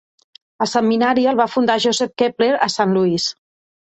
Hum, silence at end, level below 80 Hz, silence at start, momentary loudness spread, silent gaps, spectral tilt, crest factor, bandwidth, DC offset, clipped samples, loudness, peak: none; 0.65 s; -62 dBFS; 0.6 s; 5 LU; none; -4.5 dB/octave; 16 dB; 8.4 kHz; under 0.1%; under 0.1%; -17 LUFS; -2 dBFS